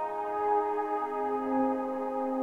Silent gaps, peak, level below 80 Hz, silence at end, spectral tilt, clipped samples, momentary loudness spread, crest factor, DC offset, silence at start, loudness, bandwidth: none; -16 dBFS; -68 dBFS; 0 s; -7 dB/octave; under 0.1%; 4 LU; 14 dB; under 0.1%; 0 s; -31 LUFS; 8 kHz